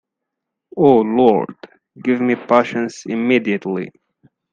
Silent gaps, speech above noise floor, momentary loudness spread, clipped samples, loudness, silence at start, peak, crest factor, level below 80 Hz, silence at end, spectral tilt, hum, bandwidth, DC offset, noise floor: none; 64 dB; 13 LU; under 0.1%; -17 LUFS; 0.75 s; 0 dBFS; 18 dB; -60 dBFS; 0.65 s; -6.5 dB/octave; none; 7.6 kHz; under 0.1%; -80 dBFS